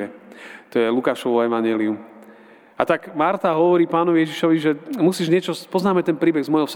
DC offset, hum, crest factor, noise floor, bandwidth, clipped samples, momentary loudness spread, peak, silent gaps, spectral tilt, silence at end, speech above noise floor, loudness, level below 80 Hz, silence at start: under 0.1%; none; 20 dB; -47 dBFS; 17 kHz; under 0.1%; 8 LU; 0 dBFS; none; -6.5 dB/octave; 0 s; 27 dB; -20 LUFS; -68 dBFS; 0 s